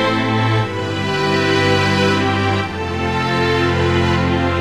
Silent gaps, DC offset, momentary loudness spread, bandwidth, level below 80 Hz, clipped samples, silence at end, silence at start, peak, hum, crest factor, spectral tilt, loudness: none; 0.7%; 6 LU; 13.5 kHz; -38 dBFS; under 0.1%; 0 s; 0 s; -2 dBFS; none; 16 dB; -6 dB/octave; -16 LUFS